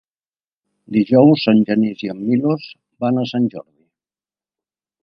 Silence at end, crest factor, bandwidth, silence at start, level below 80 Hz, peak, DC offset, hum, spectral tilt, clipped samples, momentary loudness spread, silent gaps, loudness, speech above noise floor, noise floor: 1.4 s; 18 dB; 6.2 kHz; 0.9 s; -64 dBFS; 0 dBFS; under 0.1%; none; -9 dB/octave; under 0.1%; 13 LU; none; -17 LUFS; over 74 dB; under -90 dBFS